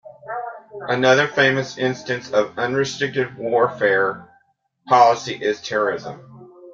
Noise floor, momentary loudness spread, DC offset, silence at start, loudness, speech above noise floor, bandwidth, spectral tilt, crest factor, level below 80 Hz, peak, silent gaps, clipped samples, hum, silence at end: -63 dBFS; 16 LU; under 0.1%; 0.05 s; -19 LUFS; 43 dB; 7.6 kHz; -4.5 dB/octave; 18 dB; -64 dBFS; -2 dBFS; none; under 0.1%; none; 0 s